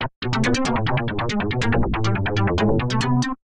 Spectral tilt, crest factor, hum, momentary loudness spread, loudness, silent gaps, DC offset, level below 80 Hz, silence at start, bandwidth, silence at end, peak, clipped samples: -6 dB/octave; 12 dB; none; 3 LU; -22 LUFS; 0.16-0.22 s; under 0.1%; -34 dBFS; 0 s; 10.5 kHz; 0.05 s; -8 dBFS; under 0.1%